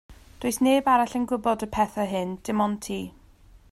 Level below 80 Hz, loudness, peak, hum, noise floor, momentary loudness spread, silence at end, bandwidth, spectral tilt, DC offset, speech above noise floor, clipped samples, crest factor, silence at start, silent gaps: -52 dBFS; -25 LUFS; -10 dBFS; none; -53 dBFS; 11 LU; 0.6 s; 15.5 kHz; -5 dB/octave; under 0.1%; 28 dB; under 0.1%; 16 dB; 0.1 s; none